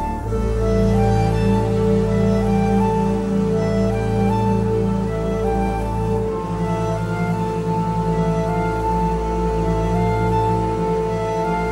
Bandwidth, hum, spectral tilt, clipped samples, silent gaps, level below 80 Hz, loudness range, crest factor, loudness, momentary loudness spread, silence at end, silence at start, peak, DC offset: 12.5 kHz; none; -8 dB/octave; under 0.1%; none; -28 dBFS; 3 LU; 12 dB; -20 LUFS; 4 LU; 0 s; 0 s; -6 dBFS; under 0.1%